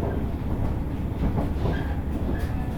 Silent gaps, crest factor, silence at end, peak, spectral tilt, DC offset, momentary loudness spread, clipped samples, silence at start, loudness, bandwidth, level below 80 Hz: none; 14 dB; 0 s; -12 dBFS; -8.5 dB/octave; under 0.1%; 3 LU; under 0.1%; 0 s; -28 LUFS; 17.5 kHz; -30 dBFS